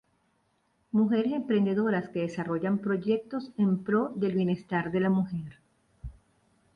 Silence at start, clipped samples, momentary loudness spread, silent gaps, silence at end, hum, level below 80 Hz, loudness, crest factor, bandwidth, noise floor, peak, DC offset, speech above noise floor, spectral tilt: 0.95 s; under 0.1%; 12 LU; none; 0.65 s; none; -58 dBFS; -28 LUFS; 16 dB; 7 kHz; -72 dBFS; -14 dBFS; under 0.1%; 44 dB; -9 dB/octave